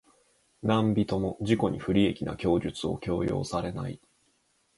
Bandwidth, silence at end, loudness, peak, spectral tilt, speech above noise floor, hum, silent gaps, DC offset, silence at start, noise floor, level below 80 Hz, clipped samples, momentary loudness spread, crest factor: 11.5 kHz; 0.8 s; -29 LUFS; -10 dBFS; -7 dB/octave; 43 dB; none; none; under 0.1%; 0.65 s; -70 dBFS; -50 dBFS; under 0.1%; 9 LU; 20 dB